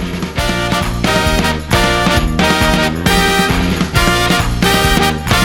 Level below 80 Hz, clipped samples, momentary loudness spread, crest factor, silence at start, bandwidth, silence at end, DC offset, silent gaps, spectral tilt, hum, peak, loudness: -22 dBFS; under 0.1%; 4 LU; 12 dB; 0 s; 19 kHz; 0 s; under 0.1%; none; -4 dB/octave; none; 0 dBFS; -13 LUFS